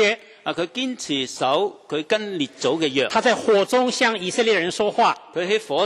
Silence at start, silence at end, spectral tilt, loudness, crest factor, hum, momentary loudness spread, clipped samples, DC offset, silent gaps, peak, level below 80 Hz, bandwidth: 0 s; 0 s; -3 dB/octave; -21 LUFS; 16 dB; none; 8 LU; under 0.1%; under 0.1%; none; -6 dBFS; -66 dBFS; 13 kHz